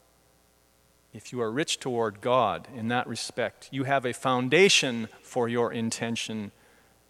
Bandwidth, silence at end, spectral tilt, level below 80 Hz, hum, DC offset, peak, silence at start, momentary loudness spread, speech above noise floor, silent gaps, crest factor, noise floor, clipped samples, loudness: 15 kHz; 0.6 s; -3.5 dB/octave; -70 dBFS; none; under 0.1%; -6 dBFS; 1.15 s; 14 LU; 36 dB; none; 22 dB; -63 dBFS; under 0.1%; -27 LUFS